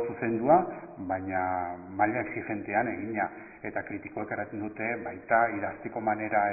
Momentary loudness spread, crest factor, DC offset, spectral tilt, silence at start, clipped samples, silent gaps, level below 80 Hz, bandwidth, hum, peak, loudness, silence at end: 12 LU; 22 dB; under 0.1%; -1 dB/octave; 0 s; under 0.1%; none; -60 dBFS; 2.7 kHz; none; -8 dBFS; -30 LUFS; 0 s